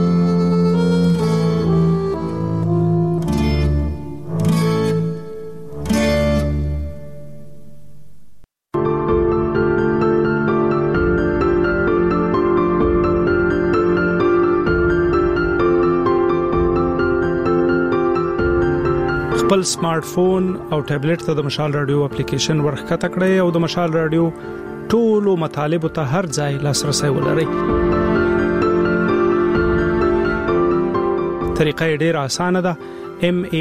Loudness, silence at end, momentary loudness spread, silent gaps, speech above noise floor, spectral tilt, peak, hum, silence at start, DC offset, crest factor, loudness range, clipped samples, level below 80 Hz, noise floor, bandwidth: -17 LUFS; 0 s; 5 LU; none; 29 dB; -6.5 dB/octave; -2 dBFS; none; 0 s; under 0.1%; 16 dB; 4 LU; under 0.1%; -32 dBFS; -46 dBFS; 14.5 kHz